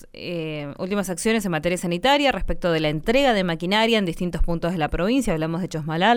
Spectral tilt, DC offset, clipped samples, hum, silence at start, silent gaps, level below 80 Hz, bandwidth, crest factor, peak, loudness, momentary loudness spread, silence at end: -5 dB/octave; under 0.1%; under 0.1%; none; 0 s; none; -34 dBFS; 17.5 kHz; 16 dB; -6 dBFS; -22 LUFS; 9 LU; 0 s